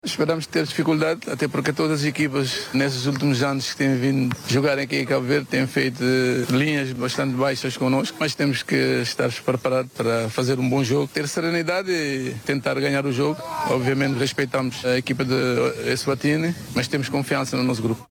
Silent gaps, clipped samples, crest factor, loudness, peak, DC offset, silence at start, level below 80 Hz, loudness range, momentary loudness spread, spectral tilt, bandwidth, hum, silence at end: none; under 0.1%; 16 dB; -22 LUFS; -6 dBFS; under 0.1%; 0.05 s; -60 dBFS; 1 LU; 3 LU; -5 dB/octave; 18 kHz; none; 0.05 s